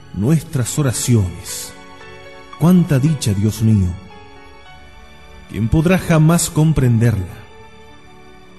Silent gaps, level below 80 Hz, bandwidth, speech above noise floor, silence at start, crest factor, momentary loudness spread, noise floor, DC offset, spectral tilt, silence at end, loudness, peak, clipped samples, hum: none; -36 dBFS; 12.5 kHz; 28 dB; 0.15 s; 16 dB; 23 LU; -43 dBFS; 0.7%; -6 dB/octave; 0.95 s; -16 LUFS; -2 dBFS; under 0.1%; none